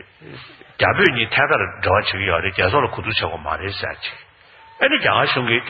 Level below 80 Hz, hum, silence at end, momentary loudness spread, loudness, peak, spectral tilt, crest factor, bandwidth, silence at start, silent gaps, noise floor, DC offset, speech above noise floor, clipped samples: -46 dBFS; none; 0 s; 15 LU; -18 LUFS; 0 dBFS; -2 dB/octave; 20 dB; 7 kHz; 0.2 s; none; -47 dBFS; under 0.1%; 28 dB; under 0.1%